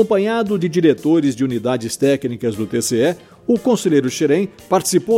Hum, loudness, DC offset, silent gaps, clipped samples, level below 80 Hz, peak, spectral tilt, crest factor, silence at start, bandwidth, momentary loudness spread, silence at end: none; -17 LUFS; under 0.1%; none; under 0.1%; -56 dBFS; -2 dBFS; -5 dB/octave; 14 dB; 0 s; 16.5 kHz; 5 LU; 0 s